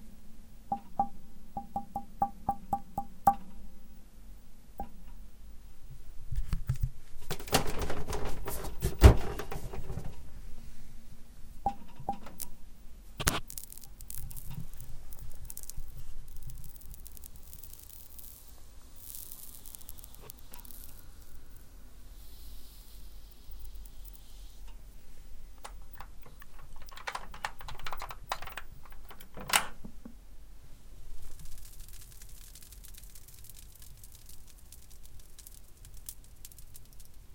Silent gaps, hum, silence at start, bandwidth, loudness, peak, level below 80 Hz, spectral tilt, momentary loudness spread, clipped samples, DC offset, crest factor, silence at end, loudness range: none; none; 0 s; 17 kHz; -35 LUFS; -2 dBFS; -40 dBFS; -4.5 dB/octave; 23 LU; under 0.1%; under 0.1%; 32 dB; 0 s; 21 LU